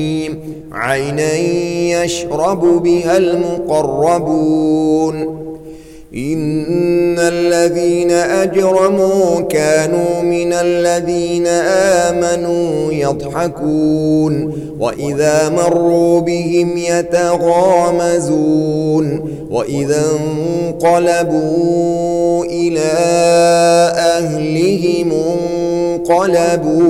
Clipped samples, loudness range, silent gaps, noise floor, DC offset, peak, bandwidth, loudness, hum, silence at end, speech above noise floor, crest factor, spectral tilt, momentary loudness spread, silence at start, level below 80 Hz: under 0.1%; 3 LU; none; -33 dBFS; under 0.1%; -2 dBFS; 14.5 kHz; -14 LUFS; none; 0 s; 20 dB; 12 dB; -5.5 dB/octave; 7 LU; 0 s; -44 dBFS